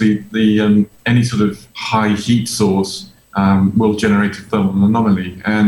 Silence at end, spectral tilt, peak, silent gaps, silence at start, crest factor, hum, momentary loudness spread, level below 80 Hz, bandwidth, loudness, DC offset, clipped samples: 0 s; -6 dB/octave; -4 dBFS; none; 0 s; 12 dB; none; 6 LU; -48 dBFS; 16.5 kHz; -15 LUFS; under 0.1%; under 0.1%